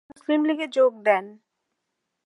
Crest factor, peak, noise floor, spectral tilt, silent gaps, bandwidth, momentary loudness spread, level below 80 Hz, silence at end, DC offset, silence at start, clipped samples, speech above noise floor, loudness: 20 dB; -4 dBFS; -80 dBFS; -5 dB/octave; none; 11 kHz; 5 LU; -82 dBFS; 0.95 s; under 0.1%; 0.3 s; under 0.1%; 57 dB; -23 LUFS